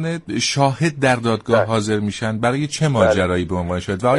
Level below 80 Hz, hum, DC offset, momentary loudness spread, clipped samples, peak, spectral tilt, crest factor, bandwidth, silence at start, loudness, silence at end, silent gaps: -46 dBFS; none; under 0.1%; 7 LU; under 0.1%; -2 dBFS; -5.5 dB/octave; 16 dB; 11.5 kHz; 0 s; -19 LUFS; 0 s; none